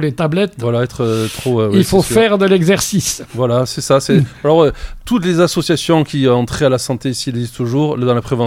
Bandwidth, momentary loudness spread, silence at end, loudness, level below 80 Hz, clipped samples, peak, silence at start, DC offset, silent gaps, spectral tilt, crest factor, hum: 16.5 kHz; 7 LU; 0 s; -14 LUFS; -38 dBFS; under 0.1%; 0 dBFS; 0 s; under 0.1%; none; -5.5 dB/octave; 14 dB; none